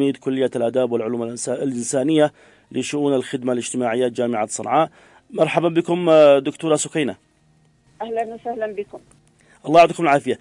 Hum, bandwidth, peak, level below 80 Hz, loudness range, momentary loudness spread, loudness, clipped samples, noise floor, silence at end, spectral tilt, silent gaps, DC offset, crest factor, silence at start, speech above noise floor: none; 11.5 kHz; -2 dBFS; -66 dBFS; 4 LU; 13 LU; -19 LUFS; under 0.1%; -58 dBFS; 0.05 s; -5 dB/octave; none; under 0.1%; 16 dB; 0 s; 39 dB